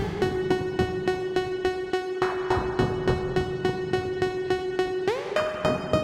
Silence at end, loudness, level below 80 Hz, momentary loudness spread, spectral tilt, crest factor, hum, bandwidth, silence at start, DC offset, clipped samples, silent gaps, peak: 0 s; -27 LUFS; -44 dBFS; 3 LU; -6.5 dB/octave; 16 dB; none; 12 kHz; 0 s; under 0.1%; under 0.1%; none; -10 dBFS